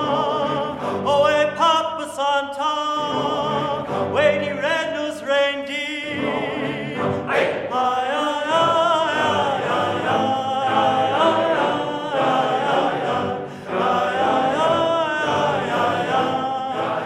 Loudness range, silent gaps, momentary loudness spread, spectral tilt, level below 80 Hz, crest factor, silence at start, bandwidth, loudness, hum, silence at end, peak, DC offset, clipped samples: 3 LU; none; 7 LU; -4.5 dB/octave; -60 dBFS; 16 dB; 0 s; 13 kHz; -20 LUFS; none; 0 s; -4 dBFS; under 0.1%; under 0.1%